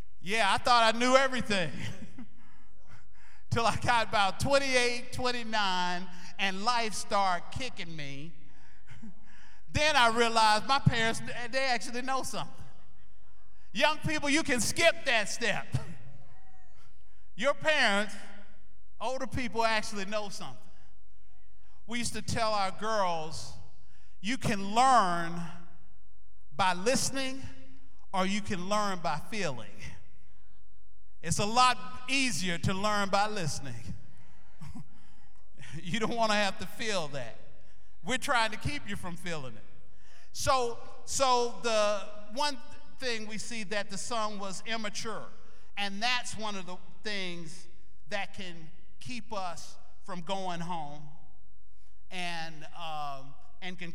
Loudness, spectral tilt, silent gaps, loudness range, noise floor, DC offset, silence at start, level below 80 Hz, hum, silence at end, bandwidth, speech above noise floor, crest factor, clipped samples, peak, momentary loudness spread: -30 LUFS; -3.5 dB/octave; none; 8 LU; -63 dBFS; 3%; 0.2 s; -56 dBFS; none; 0 s; 17 kHz; 33 dB; 26 dB; under 0.1%; -8 dBFS; 20 LU